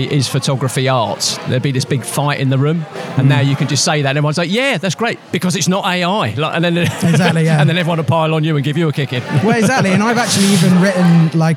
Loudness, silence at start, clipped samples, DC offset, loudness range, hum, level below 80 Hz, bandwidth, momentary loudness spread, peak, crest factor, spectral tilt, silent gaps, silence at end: -14 LUFS; 0 s; under 0.1%; under 0.1%; 2 LU; none; -62 dBFS; 15.5 kHz; 6 LU; -2 dBFS; 12 dB; -5 dB/octave; none; 0 s